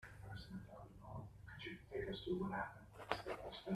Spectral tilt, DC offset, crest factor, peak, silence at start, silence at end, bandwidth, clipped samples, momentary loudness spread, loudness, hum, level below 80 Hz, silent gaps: -6.5 dB/octave; under 0.1%; 30 dB; -18 dBFS; 0 s; 0 s; 13.5 kHz; under 0.1%; 12 LU; -49 LUFS; none; -64 dBFS; none